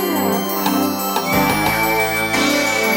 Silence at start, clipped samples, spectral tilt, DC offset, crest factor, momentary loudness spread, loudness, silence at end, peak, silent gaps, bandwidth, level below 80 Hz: 0 s; under 0.1%; -3.5 dB/octave; under 0.1%; 14 dB; 3 LU; -17 LUFS; 0 s; -4 dBFS; none; 19.5 kHz; -44 dBFS